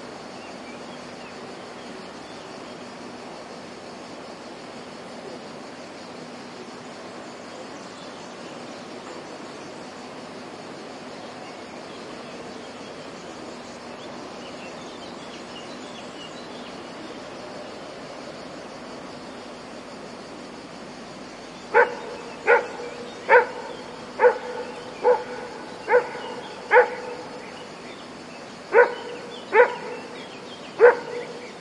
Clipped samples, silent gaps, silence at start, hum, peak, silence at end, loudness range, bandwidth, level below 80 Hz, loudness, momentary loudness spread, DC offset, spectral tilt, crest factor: under 0.1%; none; 0 s; none; -2 dBFS; 0 s; 16 LU; 11 kHz; -66 dBFS; -26 LUFS; 20 LU; under 0.1%; -3.5 dB/octave; 26 dB